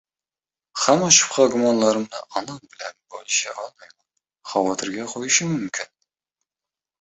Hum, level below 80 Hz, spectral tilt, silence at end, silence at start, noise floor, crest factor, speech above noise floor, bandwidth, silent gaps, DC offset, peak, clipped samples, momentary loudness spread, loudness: none; -66 dBFS; -2.5 dB/octave; 1.15 s; 0.75 s; under -90 dBFS; 22 dB; over 69 dB; 8.4 kHz; none; under 0.1%; 0 dBFS; under 0.1%; 22 LU; -20 LUFS